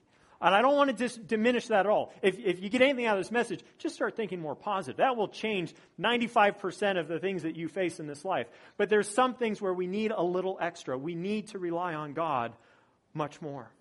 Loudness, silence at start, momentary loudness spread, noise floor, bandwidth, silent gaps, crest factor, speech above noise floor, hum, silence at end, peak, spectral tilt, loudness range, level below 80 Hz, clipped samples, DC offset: -30 LUFS; 0.4 s; 11 LU; -64 dBFS; 11.5 kHz; none; 22 dB; 35 dB; none; 0.15 s; -8 dBFS; -5 dB/octave; 5 LU; -74 dBFS; under 0.1%; under 0.1%